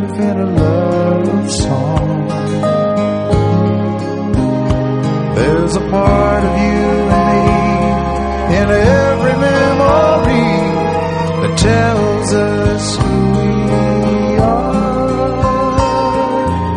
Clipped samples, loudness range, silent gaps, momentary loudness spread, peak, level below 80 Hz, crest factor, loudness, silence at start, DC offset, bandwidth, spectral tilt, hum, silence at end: under 0.1%; 3 LU; none; 5 LU; 0 dBFS; -26 dBFS; 12 dB; -13 LUFS; 0 s; under 0.1%; 10.5 kHz; -6.5 dB/octave; none; 0 s